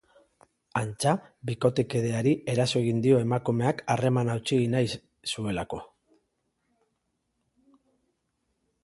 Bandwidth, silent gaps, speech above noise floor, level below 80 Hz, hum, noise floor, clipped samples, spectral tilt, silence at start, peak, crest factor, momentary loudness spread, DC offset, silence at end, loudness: 11.5 kHz; none; 51 dB; -60 dBFS; none; -77 dBFS; under 0.1%; -6 dB/octave; 0.75 s; -8 dBFS; 20 dB; 10 LU; under 0.1%; 3 s; -27 LUFS